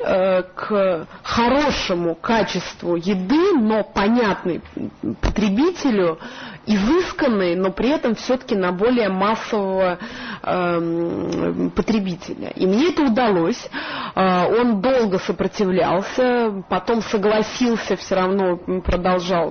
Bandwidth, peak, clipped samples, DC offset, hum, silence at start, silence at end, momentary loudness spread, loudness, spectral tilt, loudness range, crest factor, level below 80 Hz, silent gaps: 6.6 kHz; -8 dBFS; under 0.1%; under 0.1%; none; 0 s; 0 s; 8 LU; -20 LUFS; -6 dB/octave; 2 LU; 12 dB; -40 dBFS; none